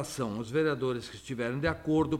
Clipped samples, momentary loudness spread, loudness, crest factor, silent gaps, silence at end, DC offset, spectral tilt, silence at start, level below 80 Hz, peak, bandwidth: under 0.1%; 7 LU; -32 LUFS; 14 dB; none; 0 s; under 0.1%; -6 dB/octave; 0 s; -54 dBFS; -16 dBFS; 15 kHz